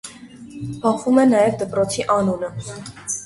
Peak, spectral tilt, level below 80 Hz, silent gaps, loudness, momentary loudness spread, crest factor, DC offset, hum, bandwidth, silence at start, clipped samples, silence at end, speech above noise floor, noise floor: -4 dBFS; -5 dB/octave; -52 dBFS; none; -19 LUFS; 18 LU; 16 dB; under 0.1%; none; 11.5 kHz; 0.05 s; under 0.1%; 0 s; 21 dB; -39 dBFS